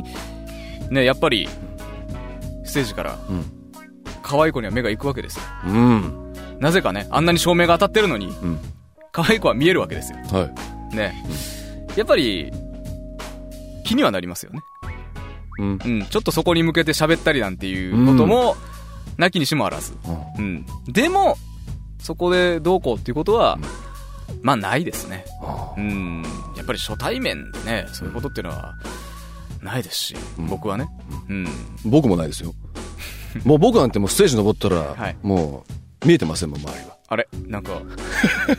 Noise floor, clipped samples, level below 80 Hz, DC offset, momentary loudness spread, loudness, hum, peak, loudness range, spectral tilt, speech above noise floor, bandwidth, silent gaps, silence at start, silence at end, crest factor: -42 dBFS; under 0.1%; -36 dBFS; under 0.1%; 19 LU; -20 LUFS; none; -2 dBFS; 8 LU; -5 dB/octave; 22 dB; 16 kHz; none; 0 s; 0 s; 20 dB